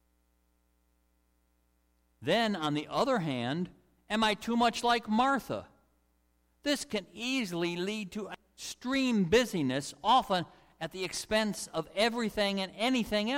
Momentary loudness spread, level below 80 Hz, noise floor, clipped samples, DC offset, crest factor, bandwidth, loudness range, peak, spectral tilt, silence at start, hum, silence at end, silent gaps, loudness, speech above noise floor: 13 LU; -60 dBFS; -72 dBFS; under 0.1%; under 0.1%; 18 dB; 16.5 kHz; 4 LU; -14 dBFS; -4.5 dB/octave; 2.2 s; 60 Hz at -65 dBFS; 0 s; none; -31 LUFS; 42 dB